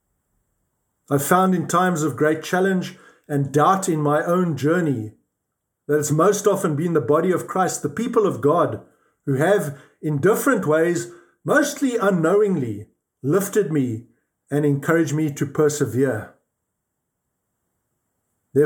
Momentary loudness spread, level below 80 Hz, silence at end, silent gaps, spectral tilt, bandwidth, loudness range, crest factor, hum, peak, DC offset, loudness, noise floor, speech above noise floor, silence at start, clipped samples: 10 LU; -68 dBFS; 0 s; none; -6 dB/octave; over 20 kHz; 3 LU; 20 dB; none; -2 dBFS; under 0.1%; -20 LUFS; -78 dBFS; 59 dB; 1.1 s; under 0.1%